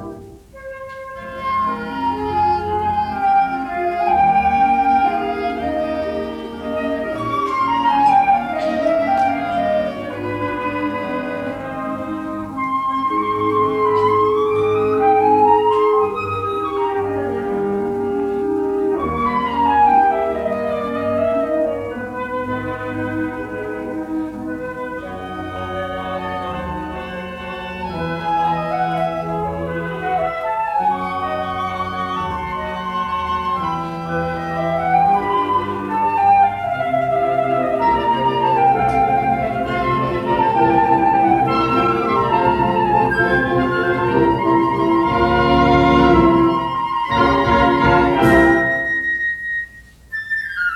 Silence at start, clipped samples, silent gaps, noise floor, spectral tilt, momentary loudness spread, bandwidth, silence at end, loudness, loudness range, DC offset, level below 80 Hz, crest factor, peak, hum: 0 s; under 0.1%; none; -39 dBFS; -7 dB/octave; 12 LU; 14 kHz; 0 s; -18 LUFS; 8 LU; under 0.1%; -40 dBFS; 16 dB; 0 dBFS; none